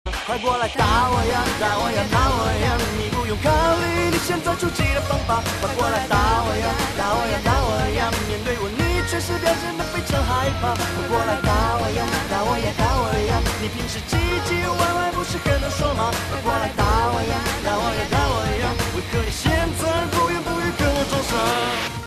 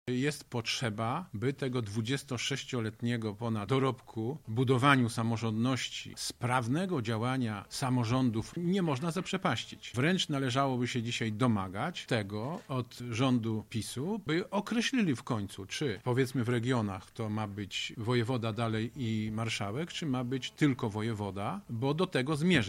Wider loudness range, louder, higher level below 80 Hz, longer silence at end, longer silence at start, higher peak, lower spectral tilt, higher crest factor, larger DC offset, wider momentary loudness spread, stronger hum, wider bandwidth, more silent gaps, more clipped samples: about the same, 2 LU vs 3 LU; first, -21 LUFS vs -33 LUFS; first, -30 dBFS vs -64 dBFS; about the same, 0 s vs 0 s; about the same, 0.05 s vs 0.05 s; first, -4 dBFS vs -8 dBFS; about the same, -4.5 dB/octave vs -5.5 dB/octave; second, 18 dB vs 24 dB; neither; second, 4 LU vs 7 LU; neither; second, 14 kHz vs 16 kHz; neither; neither